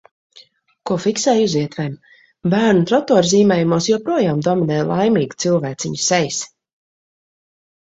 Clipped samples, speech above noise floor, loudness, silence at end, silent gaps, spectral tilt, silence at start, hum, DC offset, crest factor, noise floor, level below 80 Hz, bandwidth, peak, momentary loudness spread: under 0.1%; 33 dB; -17 LUFS; 1.45 s; none; -5 dB/octave; 0.35 s; none; under 0.1%; 18 dB; -49 dBFS; -56 dBFS; 8 kHz; 0 dBFS; 11 LU